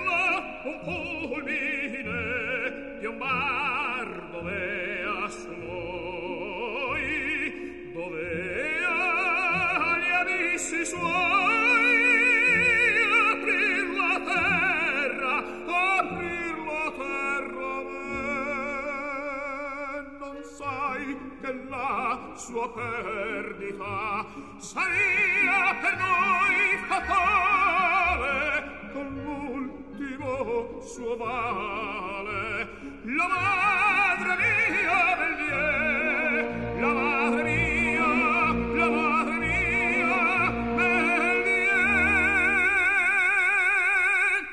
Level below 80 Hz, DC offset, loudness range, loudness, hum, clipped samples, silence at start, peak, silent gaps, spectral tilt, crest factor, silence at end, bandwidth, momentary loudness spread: -50 dBFS; 0.2%; 11 LU; -24 LUFS; none; under 0.1%; 0 s; -10 dBFS; none; -4 dB/octave; 16 dB; 0 s; 12 kHz; 14 LU